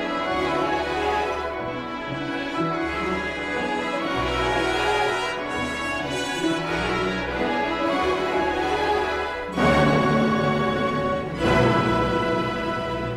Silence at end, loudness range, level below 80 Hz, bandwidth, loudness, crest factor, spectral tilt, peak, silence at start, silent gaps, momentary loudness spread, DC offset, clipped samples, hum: 0 s; 4 LU; -42 dBFS; 15 kHz; -23 LUFS; 16 dB; -5.5 dB/octave; -6 dBFS; 0 s; none; 7 LU; under 0.1%; under 0.1%; none